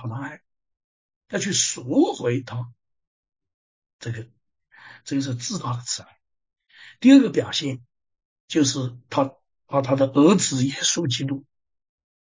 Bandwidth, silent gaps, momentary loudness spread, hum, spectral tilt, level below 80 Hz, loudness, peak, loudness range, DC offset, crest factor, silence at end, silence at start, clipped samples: 7.6 kHz; 0.84-1.09 s, 1.16-1.21 s, 3.07-3.23 s, 3.54-3.82 s, 3.93-3.99 s, 8.25-8.48 s; 17 LU; none; -4.5 dB/octave; -64 dBFS; -22 LUFS; -2 dBFS; 10 LU; under 0.1%; 22 dB; 0.85 s; 0 s; under 0.1%